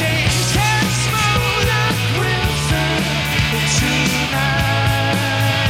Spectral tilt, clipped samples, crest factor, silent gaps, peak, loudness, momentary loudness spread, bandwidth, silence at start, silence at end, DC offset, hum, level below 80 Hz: -4 dB/octave; under 0.1%; 14 dB; none; -4 dBFS; -16 LUFS; 2 LU; 16.5 kHz; 0 s; 0 s; under 0.1%; none; -30 dBFS